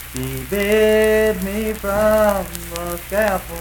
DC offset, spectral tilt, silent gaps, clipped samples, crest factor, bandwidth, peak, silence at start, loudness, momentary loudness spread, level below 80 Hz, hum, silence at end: under 0.1%; -4.5 dB/octave; none; under 0.1%; 16 dB; 19 kHz; -2 dBFS; 0 s; -18 LUFS; 12 LU; -34 dBFS; none; 0 s